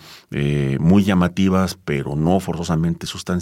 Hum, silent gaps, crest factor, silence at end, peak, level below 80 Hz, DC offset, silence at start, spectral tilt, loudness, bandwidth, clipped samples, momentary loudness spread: none; none; 16 dB; 0 s; -4 dBFS; -44 dBFS; under 0.1%; 0.05 s; -7 dB/octave; -19 LUFS; 15.5 kHz; under 0.1%; 9 LU